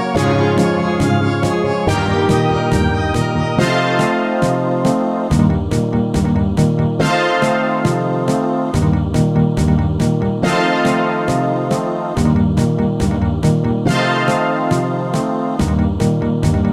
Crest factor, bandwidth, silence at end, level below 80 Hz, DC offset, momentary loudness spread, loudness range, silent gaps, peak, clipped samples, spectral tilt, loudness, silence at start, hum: 14 dB; 13.5 kHz; 0 s; -30 dBFS; under 0.1%; 3 LU; 1 LU; none; -2 dBFS; under 0.1%; -6.5 dB/octave; -16 LUFS; 0 s; none